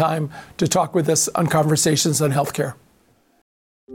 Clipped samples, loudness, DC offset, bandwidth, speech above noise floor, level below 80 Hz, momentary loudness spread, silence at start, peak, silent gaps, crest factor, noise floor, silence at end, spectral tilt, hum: under 0.1%; -19 LUFS; under 0.1%; 17 kHz; 39 dB; -58 dBFS; 9 LU; 0 s; -6 dBFS; 3.42-3.87 s; 14 dB; -59 dBFS; 0 s; -4.5 dB/octave; none